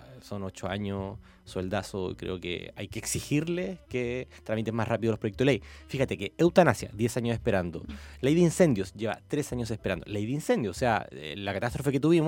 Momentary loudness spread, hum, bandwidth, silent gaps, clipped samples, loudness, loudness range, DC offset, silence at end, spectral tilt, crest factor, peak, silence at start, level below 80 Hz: 13 LU; none; 17 kHz; none; under 0.1%; -29 LUFS; 7 LU; under 0.1%; 0 s; -6 dB/octave; 22 dB; -6 dBFS; 0 s; -52 dBFS